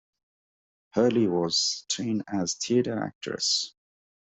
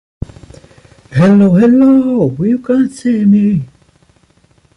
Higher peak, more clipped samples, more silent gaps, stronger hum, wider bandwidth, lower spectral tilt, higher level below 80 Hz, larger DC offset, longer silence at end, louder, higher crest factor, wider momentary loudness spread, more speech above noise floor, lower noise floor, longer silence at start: second, -10 dBFS vs -2 dBFS; neither; first, 3.15-3.21 s vs none; neither; second, 8.2 kHz vs 10.5 kHz; second, -3.5 dB/octave vs -9 dB/octave; second, -68 dBFS vs -40 dBFS; neither; second, 0.6 s vs 1.1 s; second, -26 LUFS vs -10 LUFS; first, 18 dB vs 10 dB; second, 9 LU vs 20 LU; first, over 64 dB vs 42 dB; first, under -90 dBFS vs -51 dBFS; second, 0.95 s vs 1.1 s